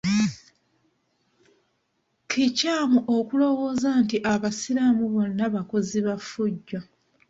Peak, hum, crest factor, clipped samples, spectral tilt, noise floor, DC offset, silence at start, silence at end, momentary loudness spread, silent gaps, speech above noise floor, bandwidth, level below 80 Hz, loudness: -10 dBFS; none; 16 dB; under 0.1%; -5 dB/octave; -73 dBFS; under 0.1%; 0.05 s; 0.45 s; 7 LU; none; 50 dB; 8 kHz; -62 dBFS; -24 LUFS